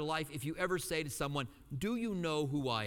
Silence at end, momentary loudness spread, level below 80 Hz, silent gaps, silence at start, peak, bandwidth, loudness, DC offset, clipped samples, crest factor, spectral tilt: 0 s; 6 LU; -58 dBFS; none; 0 s; -20 dBFS; 18.5 kHz; -37 LUFS; under 0.1%; under 0.1%; 16 dB; -5 dB/octave